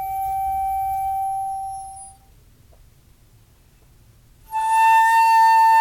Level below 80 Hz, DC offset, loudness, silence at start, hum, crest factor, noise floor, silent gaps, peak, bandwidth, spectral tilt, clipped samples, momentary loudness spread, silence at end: -50 dBFS; under 0.1%; -18 LUFS; 0 s; none; 12 dB; -53 dBFS; none; -8 dBFS; 17.5 kHz; -0.5 dB/octave; under 0.1%; 18 LU; 0 s